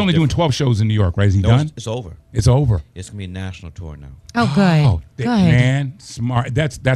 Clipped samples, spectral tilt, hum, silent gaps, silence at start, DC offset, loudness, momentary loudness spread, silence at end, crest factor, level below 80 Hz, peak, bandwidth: under 0.1%; -6.5 dB/octave; none; none; 0 s; under 0.1%; -17 LUFS; 17 LU; 0 s; 16 dB; -34 dBFS; -2 dBFS; 11.5 kHz